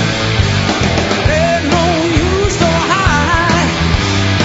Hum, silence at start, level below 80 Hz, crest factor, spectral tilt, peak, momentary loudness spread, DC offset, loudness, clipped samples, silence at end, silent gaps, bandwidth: none; 0 s; -24 dBFS; 12 dB; -5 dB/octave; 0 dBFS; 2 LU; under 0.1%; -12 LUFS; under 0.1%; 0 s; none; 8 kHz